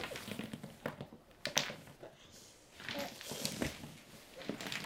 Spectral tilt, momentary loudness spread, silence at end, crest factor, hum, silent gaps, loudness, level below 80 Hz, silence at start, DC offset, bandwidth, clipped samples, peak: -2.5 dB/octave; 19 LU; 0 s; 36 dB; none; none; -42 LUFS; -66 dBFS; 0 s; under 0.1%; 17.5 kHz; under 0.1%; -8 dBFS